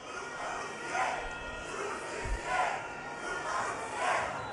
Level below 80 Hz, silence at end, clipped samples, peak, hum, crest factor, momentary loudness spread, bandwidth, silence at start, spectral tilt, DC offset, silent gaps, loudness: -48 dBFS; 0 s; under 0.1%; -18 dBFS; none; 18 dB; 7 LU; 11.5 kHz; 0 s; -3 dB/octave; under 0.1%; none; -35 LUFS